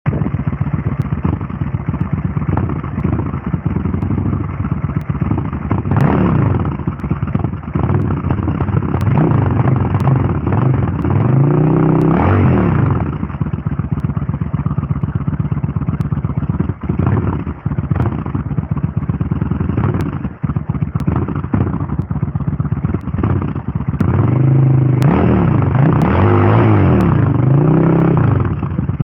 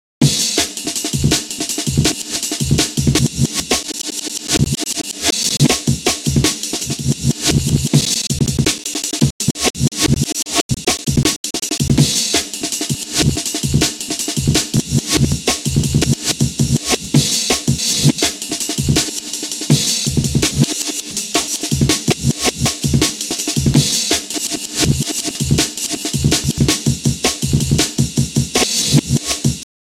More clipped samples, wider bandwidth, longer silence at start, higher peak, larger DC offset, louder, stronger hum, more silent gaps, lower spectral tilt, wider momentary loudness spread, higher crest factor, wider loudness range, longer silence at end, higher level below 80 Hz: neither; second, 3.8 kHz vs 16.5 kHz; second, 0.05 s vs 0.2 s; about the same, 0 dBFS vs 0 dBFS; neither; about the same, -16 LUFS vs -16 LUFS; neither; second, none vs 9.31-9.39 s, 9.70-9.74 s, 10.61-10.69 s, 11.36-11.44 s; first, -10.5 dB/octave vs -3.5 dB/octave; about the same, 8 LU vs 6 LU; about the same, 14 dB vs 16 dB; first, 7 LU vs 1 LU; second, 0 s vs 0.2 s; about the same, -28 dBFS vs -32 dBFS